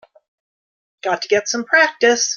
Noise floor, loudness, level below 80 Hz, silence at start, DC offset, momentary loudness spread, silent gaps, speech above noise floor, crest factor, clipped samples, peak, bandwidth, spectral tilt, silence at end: under -90 dBFS; -16 LUFS; -70 dBFS; 1.05 s; under 0.1%; 9 LU; none; over 73 dB; 18 dB; under 0.1%; -2 dBFS; 10 kHz; -0.5 dB/octave; 0 s